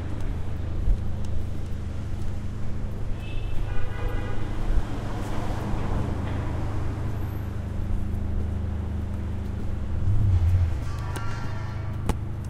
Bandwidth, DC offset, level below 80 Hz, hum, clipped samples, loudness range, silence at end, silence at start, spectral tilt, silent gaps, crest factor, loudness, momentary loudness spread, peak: 11 kHz; 0.4%; -30 dBFS; none; under 0.1%; 5 LU; 0 s; 0 s; -7.5 dB/octave; none; 16 dB; -30 LUFS; 8 LU; -10 dBFS